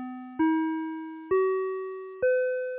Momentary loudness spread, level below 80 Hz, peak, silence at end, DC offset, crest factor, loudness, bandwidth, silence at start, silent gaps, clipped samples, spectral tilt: 12 LU; -66 dBFS; -16 dBFS; 0 s; under 0.1%; 12 dB; -28 LUFS; 3.8 kHz; 0 s; none; under 0.1%; -9 dB/octave